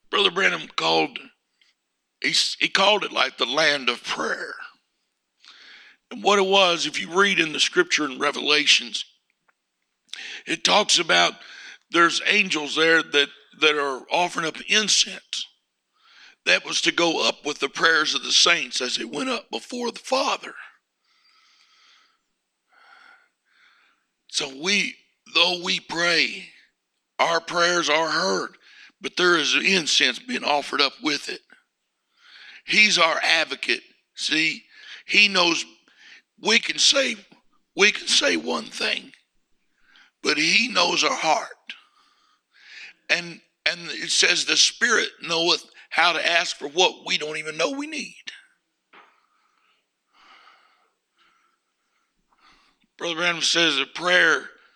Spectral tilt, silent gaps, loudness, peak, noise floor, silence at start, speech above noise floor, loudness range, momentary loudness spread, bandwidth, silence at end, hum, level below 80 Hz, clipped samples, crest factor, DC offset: -1 dB/octave; none; -20 LUFS; -2 dBFS; -77 dBFS; 0.1 s; 55 dB; 7 LU; 15 LU; 15.5 kHz; 0.25 s; none; -74 dBFS; under 0.1%; 22 dB; under 0.1%